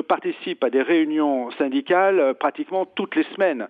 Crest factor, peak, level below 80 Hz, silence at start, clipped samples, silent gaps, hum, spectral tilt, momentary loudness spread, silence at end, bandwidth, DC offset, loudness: 16 dB; -6 dBFS; -80 dBFS; 0 s; under 0.1%; none; none; -7.5 dB/octave; 7 LU; 0 s; 4.8 kHz; under 0.1%; -21 LUFS